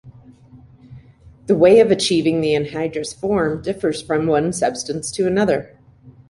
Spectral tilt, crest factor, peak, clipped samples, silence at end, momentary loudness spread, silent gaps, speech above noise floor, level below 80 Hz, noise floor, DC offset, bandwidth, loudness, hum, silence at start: -5 dB/octave; 18 dB; -2 dBFS; under 0.1%; 0.2 s; 12 LU; none; 29 dB; -50 dBFS; -46 dBFS; under 0.1%; 11.5 kHz; -18 LUFS; none; 0.05 s